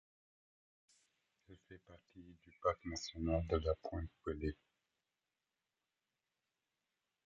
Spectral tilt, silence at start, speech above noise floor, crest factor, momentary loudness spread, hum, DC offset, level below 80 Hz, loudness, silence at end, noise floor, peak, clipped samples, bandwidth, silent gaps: -6 dB/octave; 1.5 s; over 48 dB; 24 dB; 23 LU; none; under 0.1%; -54 dBFS; -41 LUFS; 2.7 s; under -90 dBFS; -22 dBFS; under 0.1%; 8 kHz; none